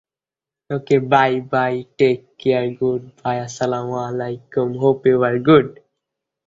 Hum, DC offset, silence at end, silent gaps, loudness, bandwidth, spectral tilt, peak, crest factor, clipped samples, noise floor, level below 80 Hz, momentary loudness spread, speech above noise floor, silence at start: none; under 0.1%; 0.75 s; none; -19 LUFS; 7.8 kHz; -6.5 dB/octave; -2 dBFS; 18 dB; under 0.1%; -90 dBFS; -58 dBFS; 10 LU; 72 dB; 0.7 s